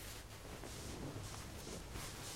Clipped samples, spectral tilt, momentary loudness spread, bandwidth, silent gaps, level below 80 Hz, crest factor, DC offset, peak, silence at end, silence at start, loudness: under 0.1%; -3.5 dB/octave; 3 LU; 16 kHz; none; -56 dBFS; 14 dB; under 0.1%; -34 dBFS; 0 s; 0 s; -49 LUFS